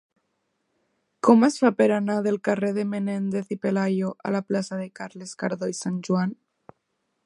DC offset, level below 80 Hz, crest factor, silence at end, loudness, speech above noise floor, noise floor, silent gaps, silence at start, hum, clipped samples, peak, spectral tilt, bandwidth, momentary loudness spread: under 0.1%; -72 dBFS; 22 dB; 0.9 s; -24 LUFS; 52 dB; -76 dBFS; none; 1.25 s; none; under 0.1%; -2 dBFS; -6.5 dB/octave; 11.5 kHz; 13 LU